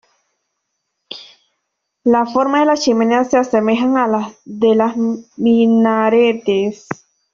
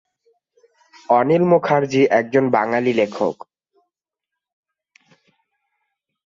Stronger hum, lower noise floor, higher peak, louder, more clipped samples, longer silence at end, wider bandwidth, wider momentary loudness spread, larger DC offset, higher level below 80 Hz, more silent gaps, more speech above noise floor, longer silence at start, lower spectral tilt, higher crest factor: neither; second, -74 dBFS vs -84 dBFS; about the same, -2 dBFS vs -2 dBFS; about the same, -15 LUFS vs -17 LUFS; neither; second, 0.4 s vs 2.95 s; about the same, 7.4 kHz vs 7.4 kHz; first, 17 LU vs 7 LU; neither; first, -60 dBFS vs -66 dBFS; neither; second, 60 dB vs 68 dB; about the same, 1.1 s vs 1.1 s; second, -5.5 dB/octave vs -7 dB/octave; about the same, 14 dB vs 18 dB